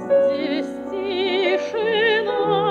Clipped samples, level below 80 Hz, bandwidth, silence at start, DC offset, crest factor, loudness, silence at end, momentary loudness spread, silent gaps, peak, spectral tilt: under 0.1%; -64 dBFS; 8.6 kHz; 0 s; under 0.1%; 12 dB; -21 LUFS; 0 s; 8 LU; none; -8 dBFS; -5.5 dB/octave